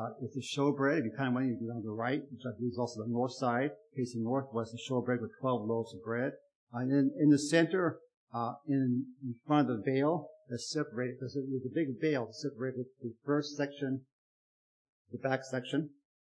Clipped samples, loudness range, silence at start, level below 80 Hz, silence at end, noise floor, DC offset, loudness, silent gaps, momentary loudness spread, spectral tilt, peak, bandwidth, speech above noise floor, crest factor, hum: under 0.1%; 6 LU; 0 s; -86 dBFS; 0.45 s; under -90 dBFS; under 0.1%; -34 LUFS; 6.55-6.67 s, 8.17-8.27 s, 14.12-15.05 s; 11 LU; -6 dB/octave; -14 dBFS; 10.5 kHz; over 57 dB; 20 dB; none